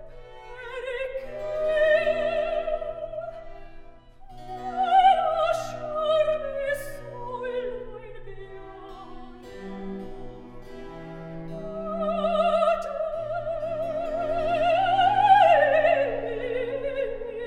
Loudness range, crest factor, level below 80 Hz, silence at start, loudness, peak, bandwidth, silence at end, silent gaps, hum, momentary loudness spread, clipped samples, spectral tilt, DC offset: 16 LU; 20 dB; -46 dBFS; 0 s; -24 LUFS; -6 dBFS; 13.5 kHz; 0 s; none; none; 24 LU; under 0.1%; -5 dB/octave; under 0.1%